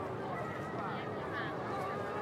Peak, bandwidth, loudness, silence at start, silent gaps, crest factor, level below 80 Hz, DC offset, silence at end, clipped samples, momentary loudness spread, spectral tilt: -26 dBFS; 16 kHz; -39 LUFS; 0 s; none; 12 dB; -68 dBFS; under 0.1%; 0 s; under 0.1%; 1 LU; -6.5 dB/octave